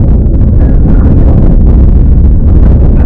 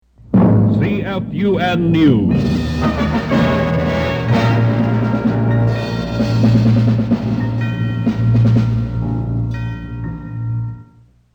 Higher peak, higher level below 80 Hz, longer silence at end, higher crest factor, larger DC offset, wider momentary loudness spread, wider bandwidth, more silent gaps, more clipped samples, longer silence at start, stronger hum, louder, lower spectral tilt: about the same, 0 dBFS vs -2 dBFS; first, -4 dBFS vs -32 dBFS; second, 0 s vs 0.5 s; second, 2 dB vs 14 dB; neither; second, 2 LU vs 10 LU; second, 2.5 kHz vs 7.2 kHz; neither; first, 30% vs under 0.1%; second, 0 s vs 0.3 s; neither; first, -7 LUFS vs -16 LUFS; first, -12.5 dB/octave vs -8.5 dB/octave